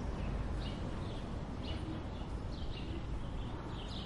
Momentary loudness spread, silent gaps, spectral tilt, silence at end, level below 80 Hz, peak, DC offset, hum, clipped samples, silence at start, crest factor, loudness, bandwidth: 3 LU; none; -7 dB/octave; 0 s; -44 dBFS; -26 dBFS; under 0.1%; none; under 0.1%; 0 s; 12 dB; -42 LUFS; 11 kHz